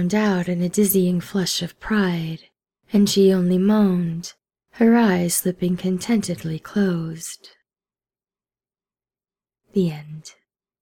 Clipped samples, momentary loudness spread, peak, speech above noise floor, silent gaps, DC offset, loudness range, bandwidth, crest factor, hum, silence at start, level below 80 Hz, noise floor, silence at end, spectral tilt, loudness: under 0.1%; 16 LU; -6 dBFS; over 70 dB; none; under 0.1%; 12 LU; 18 kHz; 16 dB; none; 0 s; -56 dBFS; under -90 dBFS; 0.5 s; -5.5 dB/octave; -20 LUFS